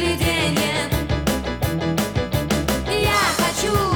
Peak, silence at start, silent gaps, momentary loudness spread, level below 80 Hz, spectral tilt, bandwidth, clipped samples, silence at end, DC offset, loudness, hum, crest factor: -4 dBFS; 0 s; none; 6 LU; -32 dBFS; -4.5 dB/octave; over 20 kHz; under 0.1%; 0 s; under 0.1%; -20 LUFS; none; 16 dB